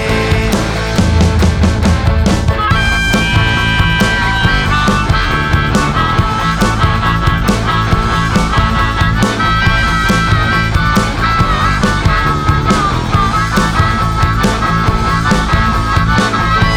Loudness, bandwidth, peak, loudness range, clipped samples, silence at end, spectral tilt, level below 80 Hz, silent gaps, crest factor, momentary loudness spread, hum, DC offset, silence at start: -12 LUFS; 18.5 kHz; 0 dBFS; 1 LU; under 0.1%; 0 s; -5 dB/octave; -18 dBFS; none; 10 dB; 2 LU; none; under 0.1%; 0 s